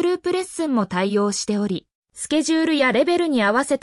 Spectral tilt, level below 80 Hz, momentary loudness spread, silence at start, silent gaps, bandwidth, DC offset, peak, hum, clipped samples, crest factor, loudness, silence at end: -4 dB/octave; -60 dBFS; 6 LU; 0 s; 1.95-2.02 s; 12 kHz; under 0.1%; -8 dBFS; none; under 0.1%; 14 dB; -20 LUFS; 0.05 s